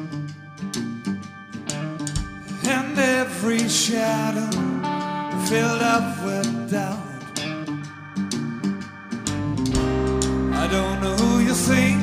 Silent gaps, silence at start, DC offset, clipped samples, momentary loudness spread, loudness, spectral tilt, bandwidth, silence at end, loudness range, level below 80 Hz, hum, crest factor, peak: none; 0 s; under 0.1%; under 0.1%; 13 LU; -23 LUFS; -4.5 dB/octave; 15.5 kHz; 0 s; 6 LU; -38 dBFS; none; 18 dB; -6 dBFS